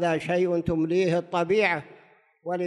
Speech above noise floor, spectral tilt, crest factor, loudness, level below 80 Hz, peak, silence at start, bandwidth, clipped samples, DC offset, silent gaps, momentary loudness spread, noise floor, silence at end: 33 dB; -6.5 dB/octave; 16 dB; -25 LUFS; -54 dBFS; -10 dBFS; 0 s; 10.5 kHz; under 0.1%; under 0.1%; none; 9 LU; -57 dBFS; 0 s